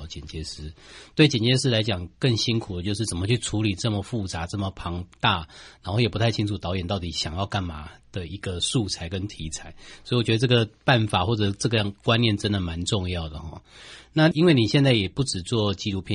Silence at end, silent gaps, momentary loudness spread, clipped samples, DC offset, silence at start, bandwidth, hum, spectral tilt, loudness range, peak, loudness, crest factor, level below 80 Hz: 0 s; none; 16 LU; under 0.1%; under 0.1%; 0 s; 11 kHz; none; -5 dB/octave; 5 LU; -4 dBFS; -24 LUFS; 20 dB; -46 dBFS